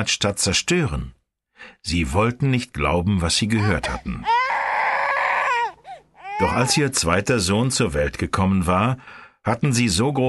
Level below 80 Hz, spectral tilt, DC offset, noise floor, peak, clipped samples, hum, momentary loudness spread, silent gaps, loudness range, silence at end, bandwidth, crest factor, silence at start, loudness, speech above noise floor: -38 dBFS; -4 dB/octave; under 0.1%; -42 dBFS; -4 dBFS; under 0.1%; none; 8 LU; none; 2 LU; 0 s; 12 kHz; 18 dB; 0 s; -21 LUFS; 21 dB